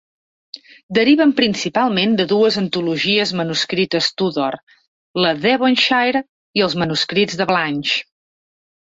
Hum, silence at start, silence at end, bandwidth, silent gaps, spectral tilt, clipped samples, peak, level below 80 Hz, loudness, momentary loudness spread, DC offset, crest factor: none; 0.55 s; 0.8 s; 8 kHz; 0.83-0.89 s, 4.63-4.67 s, 4.88-5.14 s, 6.29-6.54 s; -4.5 dB/octave; under 0.1%; -2 dBFS; -58 dBFS; -17 LUFS; 9 LU; under 0.1%; 16 dB